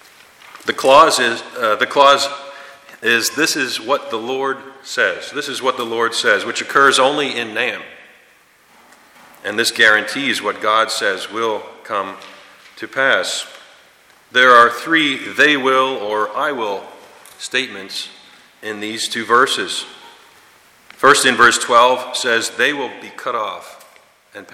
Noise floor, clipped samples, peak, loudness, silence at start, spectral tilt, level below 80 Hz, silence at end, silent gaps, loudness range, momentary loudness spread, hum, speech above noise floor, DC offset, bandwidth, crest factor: -51 dBFS; under 0.1%; 0 dBFS; -15 LUFS; 0.45 s; -1.5 dB/octave; -62 dBFS; 0.1 s; none; 6 LU; 16 LU; none; 35 dB; under 0.1%; 16.5 kHz; 18 dB